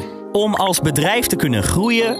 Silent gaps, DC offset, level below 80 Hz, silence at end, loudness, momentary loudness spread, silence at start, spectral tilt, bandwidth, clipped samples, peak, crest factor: none; under 0.1%; -40 dBFS; 0 s; -17 LUFS; 3 LU; 0 s; -4 dB/octave; 16 kHz; under 0.1%; -6 dBFS; 12 dB